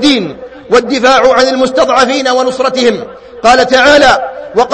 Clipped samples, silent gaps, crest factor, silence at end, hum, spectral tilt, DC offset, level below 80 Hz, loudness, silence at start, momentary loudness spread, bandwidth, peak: 1%; none; 8 dB; 0 s; none; -3 dB/octave; under 0.1%; -38 dBFS; -8 LUFS; 0 s; 9 LU; 11 kHz; 0 dBFS